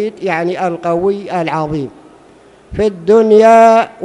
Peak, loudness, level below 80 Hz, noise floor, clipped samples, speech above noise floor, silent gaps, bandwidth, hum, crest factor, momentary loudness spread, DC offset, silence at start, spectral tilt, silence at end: 0 dBFS; -12 LUFS; -44 dBFS; -43 dBFS; 0.6%; 32 dB; none; 10.5 kHz; none; 12 dB; 14 LU; under 0.1%; 0 s; -6.5 dB/octave; 0 s